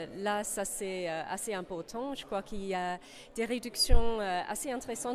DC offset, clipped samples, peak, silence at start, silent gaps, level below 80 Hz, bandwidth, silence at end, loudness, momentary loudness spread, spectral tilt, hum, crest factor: under 0.1%; under 0.1%; -10 dBFS; 0 s; none; -36 dBFS; 15 kHz; 0 s; -34 LUFS; 9 LU; -3.5 dB/octave; none; 20 dB